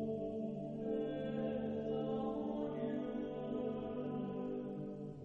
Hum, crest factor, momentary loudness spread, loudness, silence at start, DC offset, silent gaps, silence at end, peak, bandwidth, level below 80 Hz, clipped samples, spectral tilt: none; 12 dB; 4 LU; -41 LUFS; 0 s; under 0.1%; none; 0 s; -28 dBFS; 6.6 kHz; -66 dBFS; under 0.1%; -9.5 dB/octave